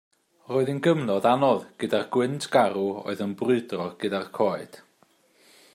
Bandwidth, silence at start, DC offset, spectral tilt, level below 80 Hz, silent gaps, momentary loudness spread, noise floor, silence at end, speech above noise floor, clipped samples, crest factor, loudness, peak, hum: 15.5 kHz; 0.5 s; under 0.1%; -6 dB/octave; -74 dBFS; none; 8 LU; -63 dBFS; 0.95 s; 38 dB; under 0.1%; 20 dB; -25 LUFS; -6 dBFS; none